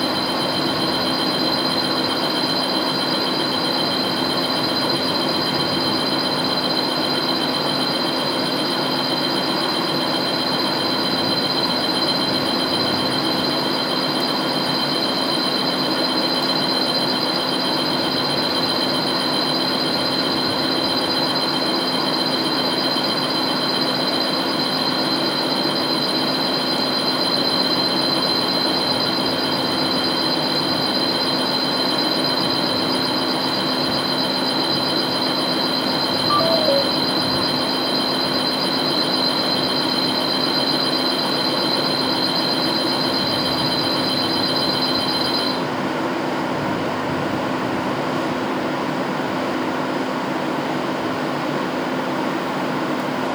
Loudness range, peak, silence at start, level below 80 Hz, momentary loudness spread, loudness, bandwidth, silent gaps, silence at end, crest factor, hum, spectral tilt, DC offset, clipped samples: 4 LU; -4 dBFS; 0 s; -58 dBFS; 5 LU; -19 LUFS; over 20 kHz; none; 0 s; 16 dB; none; -4 dB/octave; under 0.1%; under 0.1%